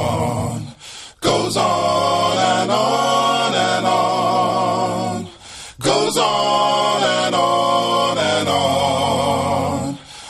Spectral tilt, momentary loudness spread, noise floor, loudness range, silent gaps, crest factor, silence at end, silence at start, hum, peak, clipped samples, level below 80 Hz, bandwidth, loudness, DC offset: -4 dB/octave; 9 LU; -38 dBFS; 2 LU; none; 14 dB; 0 s; 0 s; none; -2 dBFS; under 0.1%; -50 dBFS; 13.5 kHz; -17 LUFS; under 0.1%